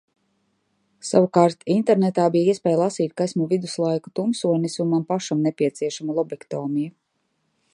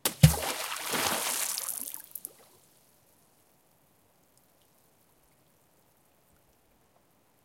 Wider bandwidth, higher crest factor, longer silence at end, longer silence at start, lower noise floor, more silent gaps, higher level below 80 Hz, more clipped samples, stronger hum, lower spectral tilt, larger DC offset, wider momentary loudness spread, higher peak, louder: second, 11 kHz vs 17 kHz; second, 20 dB vs 30 dB; second, 0.85 s vs 5.15 s; first, 1.05 s vs 0.05 s; first, -72 dBFS vs -67 dBFS; neither; second, -70 dBFS vs -50 dBFS; neither; neither; first, -6.5 dB/octave vs -4 dB/octave; neither; second, 8 LU vs 18 LU; about the same, -2 dBFS vs -4 dBFS; first, -22 LUFS vs -29 LUFS